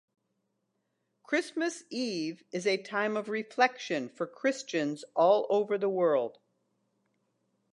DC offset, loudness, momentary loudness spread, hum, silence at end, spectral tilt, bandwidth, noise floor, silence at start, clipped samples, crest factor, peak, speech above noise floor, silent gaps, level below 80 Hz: under 0.1%; -30 LUFS; 9 LU; none; 1.4 s; -4 dB/octave; 11 kHz; -80 dBFS; 1.3 s; under 0.1%; 22 dB; -10 dBFS; 50 dB; none; -88 dBFS